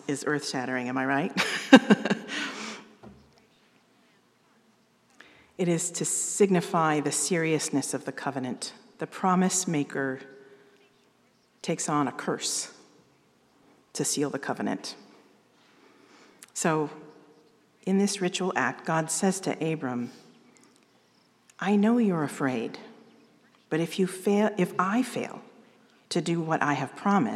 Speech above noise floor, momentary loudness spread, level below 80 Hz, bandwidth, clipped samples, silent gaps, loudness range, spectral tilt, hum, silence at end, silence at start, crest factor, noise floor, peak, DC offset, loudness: 38 dB; 14 LU; -80 dBFS; 14.5 kHz; under 0.1%; none; 9 LU; -4 dB/octave; 60 Hz at -60 dBFS; 0 s; 0.05 s; 28 dB; -65 dBFS; 0 dBFS; under 0.1%; -27 LUFS